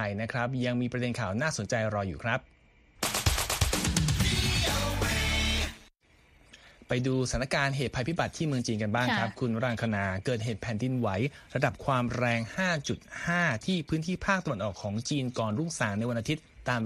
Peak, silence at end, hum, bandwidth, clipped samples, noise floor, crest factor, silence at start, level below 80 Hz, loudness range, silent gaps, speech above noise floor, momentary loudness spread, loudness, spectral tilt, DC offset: -10 dBFS; 0 s; none; 15.5 kHz; under 0.1%; -62 dBFS; 20 dB; 0 s; -42 dBFS; 3 LU; none; 32 dB; 6 LU; -30 LUFS; -4.5 dB/octave; under 0.1%